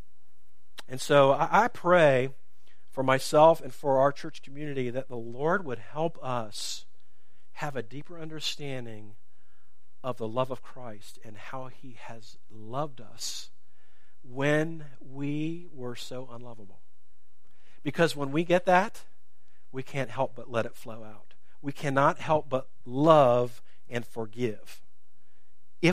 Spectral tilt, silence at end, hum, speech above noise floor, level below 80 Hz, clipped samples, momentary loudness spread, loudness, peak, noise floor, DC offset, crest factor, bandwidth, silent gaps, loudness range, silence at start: -5.5 dB/octave; 0 s; none; 45 dB; -68 dBFS; under 0.1%; 23 LU; -28 LUFS; -4 dBFS; -73 dBFS; 2%; 26 dB; 15.5 kHz; none; 14 LU; 0.9 s